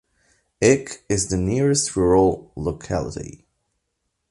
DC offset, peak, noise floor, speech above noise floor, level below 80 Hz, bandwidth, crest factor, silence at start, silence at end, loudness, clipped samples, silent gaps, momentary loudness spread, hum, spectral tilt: under 0.1%; -2 dBFS; -76 dBFS; 55 dB; -40 dBFS; 11.5 kHz; 20 dB; 0.6 s; 1 s; -21 LUFS; under 0.1%; none; 12 LU; none; -5 dB/octave